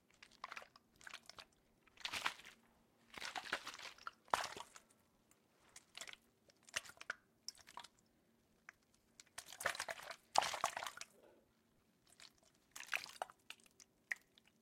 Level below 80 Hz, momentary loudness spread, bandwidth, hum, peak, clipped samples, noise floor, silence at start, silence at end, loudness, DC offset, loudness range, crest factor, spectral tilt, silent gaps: -84 dBFS; 22 LU; 16.5 kHz; none; -16 dBFS; under 0.1%; -77 dBFS; 0.2 s; 0.45 s; -46 LUFS; under 0.1%; 8 LU; 34 dB; 0 dB/octave; none